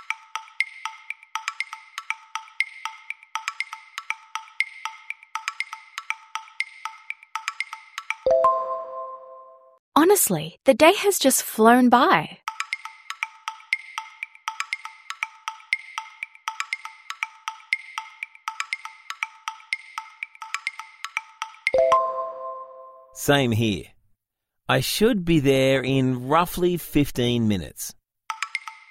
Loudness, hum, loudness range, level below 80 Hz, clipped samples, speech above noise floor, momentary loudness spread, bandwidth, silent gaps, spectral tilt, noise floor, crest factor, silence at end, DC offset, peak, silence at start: -24 LUFS; none; 12 LU; -52 dBFS; under 0.1%; 61 dB; 18 LU; 16 kHz; 9.79-9.92 s; -4 dB/octave; -81 dBFS; 22 dB; 0.15 s; under 0.1%; -2 dBFS; 0.1 s